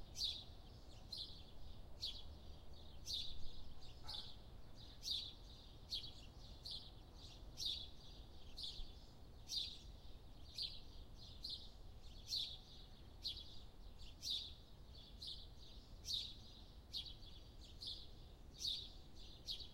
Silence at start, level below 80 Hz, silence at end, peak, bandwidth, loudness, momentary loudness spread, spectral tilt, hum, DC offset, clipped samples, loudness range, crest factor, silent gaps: 0 s; -60 dBFS; 0 s; -30 dBFS; 16 kHz; -49 LUFS; 16 LU; -2.5 dB/octave; none; under 0.1%; under 0.1%; 2 LU; 20 dB; none